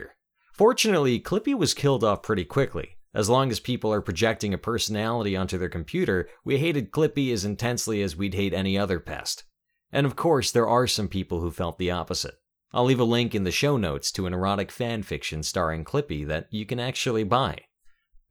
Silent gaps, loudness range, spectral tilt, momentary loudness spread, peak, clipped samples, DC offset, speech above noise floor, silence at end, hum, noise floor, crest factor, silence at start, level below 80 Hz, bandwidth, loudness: none; 3 LU; -5 dB/octave; 9 LU; -6 dBFS; under 0.1%; under 0.1%; 33 dB; 0.4 s; none; -58 dBFS; 18 dB; 0 s; -48 dBFS; over 20 kHz; -25 LUFS